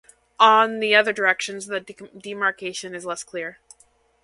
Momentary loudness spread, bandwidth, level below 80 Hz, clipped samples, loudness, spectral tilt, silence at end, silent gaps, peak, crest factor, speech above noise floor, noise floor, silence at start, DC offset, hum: 19 LU; 11.5 kHz; -70 dBFS; under 0.1%; -21 LUFS; -2 dB/octave; 0.7 s; none; 0 dBFS; 22 dB; 38 dB; -60 dBFS; 0.4 s; under 0.1%; none